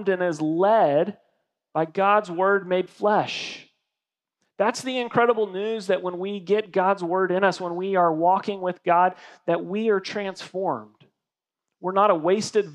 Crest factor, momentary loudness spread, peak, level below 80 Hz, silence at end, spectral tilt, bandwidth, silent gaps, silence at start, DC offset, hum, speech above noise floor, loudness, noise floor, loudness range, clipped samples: 20 dB; 10 LU; -4 dBFS; -84 dBFS; 0 s; -5.5 dB/octave; 11.5 kHz; none; 0 s; under 0.1%; none; 65 dB; -23 LUFS; -88 dBFS; 3 LU; under 0.1%